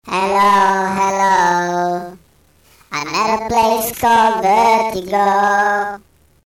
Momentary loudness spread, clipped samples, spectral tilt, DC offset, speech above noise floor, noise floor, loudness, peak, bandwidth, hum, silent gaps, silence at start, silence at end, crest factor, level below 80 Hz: 11 LU; under 0.1%; -3.5 dB/octave; under 0.1%; 39 dB; -52 dBFS; -15 LUFS; -6 dBFS; 19.5 kHz; none; none; 0.05 s; 0.5 s; 10 dB; -48 dBFS